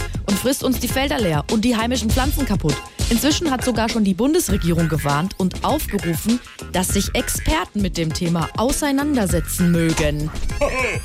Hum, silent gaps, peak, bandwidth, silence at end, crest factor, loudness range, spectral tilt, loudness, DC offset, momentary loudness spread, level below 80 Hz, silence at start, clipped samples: none; none; -6 dBFS; 16 kHz; 0 s; 12 dB; 2 LU; -4.5 dB/octave; -20 LUFS; under 0.1%; 5 LU; -30 dBFS; 0 s; under 0.1%